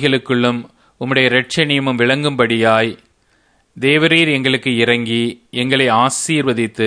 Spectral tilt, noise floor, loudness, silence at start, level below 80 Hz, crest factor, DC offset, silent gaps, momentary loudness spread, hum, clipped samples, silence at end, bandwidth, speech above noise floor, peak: -4.5 dB/octave; -57 dBFS; -14 LUFS; 0 s; -58 dBFS; 16 dB; under 0.1%; none; 7 LU; none; under 0.1%; 0 s; 11 kHz; 42 dB; 0 dBFS